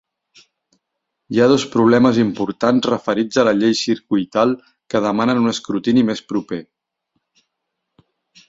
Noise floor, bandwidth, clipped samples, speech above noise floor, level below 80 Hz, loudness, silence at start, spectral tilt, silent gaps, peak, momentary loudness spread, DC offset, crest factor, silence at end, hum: -77 dBFS; 7.8 kHz; under 0.1%; 61 dB; -58 dBFS; -17 LUFS; 1.3 s; -5.5 dB/octave; none; 0 dBFS; 9 LU; under 0.1%; 18 dB; 1.85 s; none